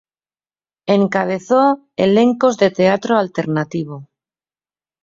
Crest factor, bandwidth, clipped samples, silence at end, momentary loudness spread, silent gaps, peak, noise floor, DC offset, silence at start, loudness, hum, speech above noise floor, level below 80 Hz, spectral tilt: 16 dB; 7.6 kHz; under 0.1%; 1 s; 11 LU; none; -2 dBFS; under -90 dBFS; under 0.1%; 0.85 s; -16 LUFS; none; over 75 dB; -60 dBFS; -6.5 dB/octave